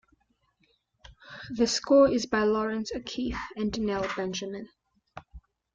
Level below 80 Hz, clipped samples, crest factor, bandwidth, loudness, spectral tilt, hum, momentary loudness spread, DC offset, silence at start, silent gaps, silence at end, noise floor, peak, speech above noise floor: -52 dBFS; under 0.1%; 20 dB; 9 kHz; -27 LUFS; -4 dB/octave; none; 24 LU; under 0.1%; 1.1 s; none; 0.35 s; -71 dBFS; -10 dBFS; 44 dB